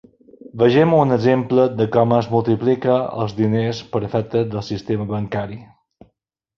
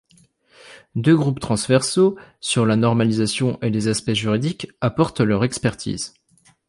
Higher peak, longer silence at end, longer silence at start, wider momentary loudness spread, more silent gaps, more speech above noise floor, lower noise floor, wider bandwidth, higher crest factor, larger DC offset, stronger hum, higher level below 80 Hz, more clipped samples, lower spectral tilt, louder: about the same, -2 dBFS vs -4 dBFS; first, 0.9 s vs 0.6 s; about the same, 0.55 s vs 0.65 s; about the same, 11 LU vs 10 LU; neither; first, 52 dB vs 38 dB; first, -70 dBFS vs -58 dBFS; second, 7 kHz vs 11.5 kHz; about the same, 18 dB vs 18 dB; neither; neither; about the same, -52 dBFS vs -50 dBFS; neither; first, -8 dB/octave vs -5.5 dB/octave; about the same, -18 LUFS vs -20 LUFS